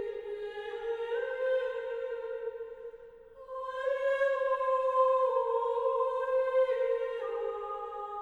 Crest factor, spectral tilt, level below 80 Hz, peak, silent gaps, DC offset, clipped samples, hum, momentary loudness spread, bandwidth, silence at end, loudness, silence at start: 16 dB; -3 dB/octave; -68 dBFS; -16 dBFS; none; under 0.1%; under 0.1%; none; 13 LU; 7 kHz; 0 s; -32 LUFS; 0 s